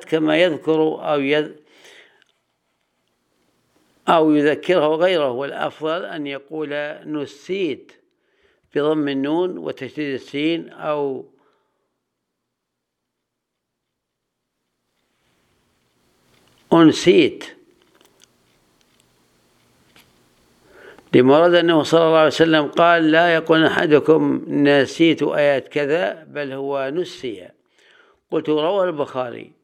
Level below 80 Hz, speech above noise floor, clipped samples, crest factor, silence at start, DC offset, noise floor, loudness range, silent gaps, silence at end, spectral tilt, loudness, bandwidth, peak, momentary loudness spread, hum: -66 dBFS; 61 dB; under 0.1%; 20 dB; 0 s; under 0.1%; -79 dBFS; 12 LU; none; 0.2 s; -5.5 dB/octave; -18 LUFS; 10.5 kHz; 0 dBFS; 14 LU; none